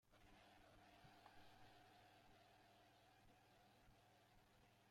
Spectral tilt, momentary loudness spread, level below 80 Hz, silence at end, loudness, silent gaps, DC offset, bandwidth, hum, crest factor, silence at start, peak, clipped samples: -4 dB/octave; 2 LU; -82 dBFS; 0 s; -69 LUFS; none; under 0.1%; 16 kHz; none; 18 dB; 0 s; -52 dBFS; under 0.1%